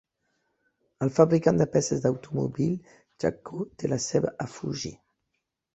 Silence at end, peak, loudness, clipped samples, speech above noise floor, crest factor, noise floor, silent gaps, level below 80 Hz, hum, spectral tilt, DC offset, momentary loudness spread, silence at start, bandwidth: 0.8 s; -4 dBFS; -27 LUFS; under 0.1%; 55 dB; 24 dB; -81 dBFS; none; -58 dBFS; none; -6 dB/octave; under 0.1%; 14 LU; 1 s; 8.2 kHz